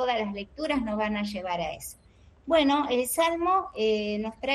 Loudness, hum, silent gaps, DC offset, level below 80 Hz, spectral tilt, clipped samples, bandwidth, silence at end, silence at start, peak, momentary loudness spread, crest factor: -27 LUFS; none; none; under 0.1%; -54 dBFS; -4 dB/octave; under 0.1%; 13.5 kHz; 0 s; 0 s; -10 dBFS; 10 LU; 18 dB